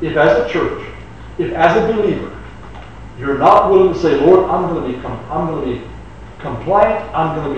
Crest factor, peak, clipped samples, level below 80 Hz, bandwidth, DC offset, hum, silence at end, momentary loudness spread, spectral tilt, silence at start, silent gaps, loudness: 16 dB; 0 dBFS; under 0.1%; -36 dBFS; 8.4 kHz; 0.9%; none; 0 s; 23 LU; -7.5 dB/octave; 0 s; none; -15 LUFS